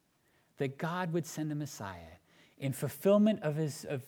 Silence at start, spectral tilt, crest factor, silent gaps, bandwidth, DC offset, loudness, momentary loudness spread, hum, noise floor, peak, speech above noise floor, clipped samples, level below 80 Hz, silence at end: 0.6 s; -6.5 dB/octave; 18 dB; none; 19 kHz; under 0.1%; -33 LUFS; 14 LU; none; -72 dBFS; -16 dBFS; 39 dB; under 0.1%; -72 dBFS; 0 s